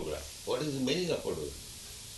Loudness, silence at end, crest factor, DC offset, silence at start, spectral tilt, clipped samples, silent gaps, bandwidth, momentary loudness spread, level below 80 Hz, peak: -35 LUFS; 0 s; 18 dB; under 0.1%; 0 s; -4 dB/octave; under 0.1%; none; 12 kHz; 12 LU; -54 dBFS; -18 dBFS